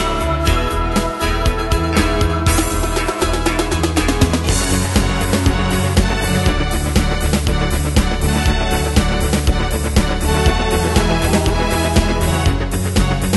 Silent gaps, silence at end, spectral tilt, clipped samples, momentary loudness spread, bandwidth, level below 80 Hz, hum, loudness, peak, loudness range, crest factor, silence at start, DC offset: none; 0 s; -5 dB/octave; under 0.1%; 3 LU; 12.5 kHz; -20 dBFS; none; -17 LUFS; 0 dBFS; 1 LU; 16 dB; 0 s; under 0.1%